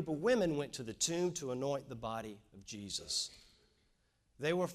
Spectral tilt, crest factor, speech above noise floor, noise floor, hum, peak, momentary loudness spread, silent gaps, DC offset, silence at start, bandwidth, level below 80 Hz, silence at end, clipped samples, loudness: -3.5 dB/octave; 20 dB; 38 dB; -76 dBFS; none; -20 dBFS; 13 LU; none; under 0.1%; 0 s; 15.5 kHz; -66 dBFS; 0 s; under 0.1%; -37 LUFS